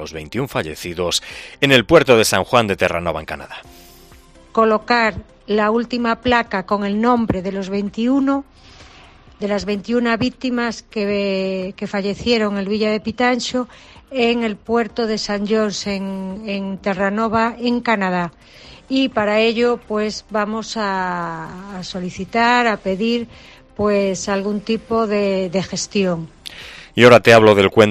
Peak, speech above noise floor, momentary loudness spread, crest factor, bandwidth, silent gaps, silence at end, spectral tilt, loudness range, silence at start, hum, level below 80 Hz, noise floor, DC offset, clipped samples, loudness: 0 dBFS; 27 dB; 14 LU; 18 dB; 15 kHz; none; 0 s; -4.5 dB/octave; 5 LU; 0 s; none; -46 dBFS; -45 dBFS; under 0.1%; under 0.1%; -18 LUFS